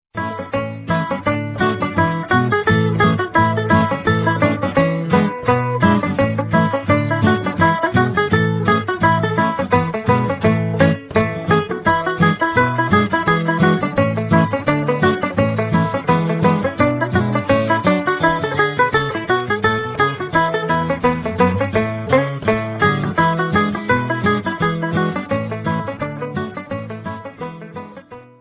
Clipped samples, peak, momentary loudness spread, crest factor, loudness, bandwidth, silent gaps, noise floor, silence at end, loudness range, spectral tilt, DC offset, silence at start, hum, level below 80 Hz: under 0.1%; -2 dBFS; 7 LU; 16 dB; -17 LUFS; 4 kHz; none; -38 dBFS; 0.15 s; 2 LU; -10.5 dB/octave; under 0.1%; 0.15 s; none; -40 dBFS